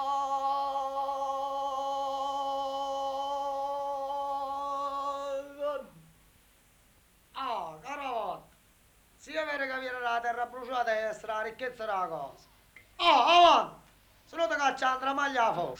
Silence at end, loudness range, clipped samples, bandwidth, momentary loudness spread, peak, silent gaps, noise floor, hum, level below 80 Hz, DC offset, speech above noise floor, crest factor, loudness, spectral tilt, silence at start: 0 s; 12 LU; under 0.1%; over 20 kHz; 12 LU; -8 dBFS; none; -63 dBFS; none; -66 dBFS; under 0.1%; 36 dB; 22 dB; -30 LUFS; -2.5 dB/octave; 0 s